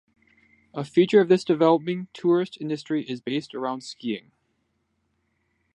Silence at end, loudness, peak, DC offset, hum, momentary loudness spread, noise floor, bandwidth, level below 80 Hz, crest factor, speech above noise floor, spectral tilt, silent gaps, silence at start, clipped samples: 1.55 s; -24 LUFS; -6 dBFS; under 0.1%; none; 13 LU; -73 dBFS; 9.8 kHz; -72 dBFS; 20 dB; 50 dB; -6.5 dB/octave; none; 0.75 s; under 0.1%